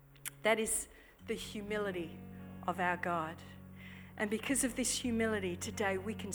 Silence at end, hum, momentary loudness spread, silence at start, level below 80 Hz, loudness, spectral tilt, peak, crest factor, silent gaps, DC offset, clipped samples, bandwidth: 0 s; none; 18 LU; 0 s; -62 dBFS; -36 LUFS; -3.5 dB/octave; -16 dBFS; 22 dB; none; under 0.1%; under 0.1%; over 20 kHz